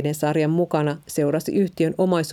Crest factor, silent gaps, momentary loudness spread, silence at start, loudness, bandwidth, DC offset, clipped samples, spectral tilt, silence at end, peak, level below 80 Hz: 14 dB; none; 3 LU; 0 s; -22 LUFS; 16.5 kHz; under 0.1%; under 0.1%; -6.5 dB/octave; 0 s; -6 dBFS; -62 dBFS